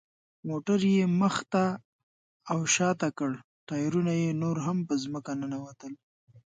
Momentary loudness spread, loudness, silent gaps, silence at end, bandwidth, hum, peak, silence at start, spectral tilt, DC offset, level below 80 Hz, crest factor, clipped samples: 16 LU; -29 LUFS; 1.85-2.40 s, 3.44-3.67 s, 6.03-6.27 s; 0.1 s; 9.6 kHz; none; -12 dBFS; 0.45 s; -5 dB/octave; under 0.1%; -72 dBFS; 16 dB; under 0.1%